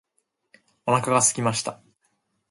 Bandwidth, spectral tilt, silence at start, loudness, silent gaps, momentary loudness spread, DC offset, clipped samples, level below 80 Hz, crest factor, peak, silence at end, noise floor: 12 kHz; -3.5 dB/octave; 0.85 s; -22 LUFS; none; 13 LU; under 0.1%; under 0.1%; -66 dBFS; 22 dB; -4 dBFS; 0.75 s; -74 dBFS